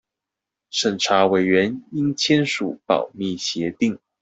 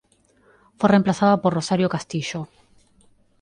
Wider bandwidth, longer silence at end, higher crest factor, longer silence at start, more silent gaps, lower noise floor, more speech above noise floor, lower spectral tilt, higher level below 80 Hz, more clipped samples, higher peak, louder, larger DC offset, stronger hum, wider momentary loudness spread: second, 8.2 kHz vs 10 kHz; second, 0.25 s vs 0.95 s; about the same, 18 dB vs 20 dB; about the same, 0.75 s vs 0.8 s; neither; first, -85 dBFS vs -59 dBFS; first, 65 dB vs 39 dB; second, -4.5 dB/octave vs -6 dB/octave; about the same, -62 dBFS vs -58 dBFS; neither; about the same, -4 dBFS vs -4 dBFS; about the same, -21 LUFS vs -21 LUFS; neither; neither; second, 8 LU vs 13 LU